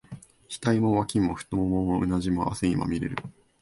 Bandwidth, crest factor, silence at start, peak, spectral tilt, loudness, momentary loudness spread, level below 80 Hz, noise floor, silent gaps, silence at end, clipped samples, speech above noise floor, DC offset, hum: 11.5 kHz; 16 dB; 0.1 s; -10 dBFS; -6.5 dB/octave; -26 LUFS; 16 LU; -46 dBFS; -45 dBFS; none; 0.3 s; under 0.1%; 20 dB; under 0.1%; none